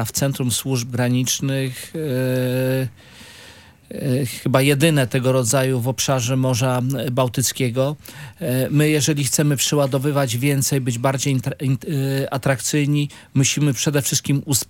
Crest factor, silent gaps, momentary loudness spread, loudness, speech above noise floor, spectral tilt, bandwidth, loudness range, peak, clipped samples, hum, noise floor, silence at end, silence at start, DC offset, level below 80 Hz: 18 dB; none; 7 LU; -20 LUFS; 25 dB; -4.5 dB/octave; 17 kHz; 4 LU; -2 dBFS; under 0.1%; none; -45 dBFS; 0.05 s; 0 s; under 0.1%; -56 dBFS